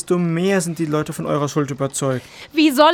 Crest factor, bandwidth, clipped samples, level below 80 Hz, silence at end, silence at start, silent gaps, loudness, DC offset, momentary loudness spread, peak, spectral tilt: 18 dB; 18 kHz; under 0.1%; -58 dBFS; 0 s; 0.05 s; none; -20 LUFS; under 0.1%; 6 LU; 0 dBFS; -5 dB/octave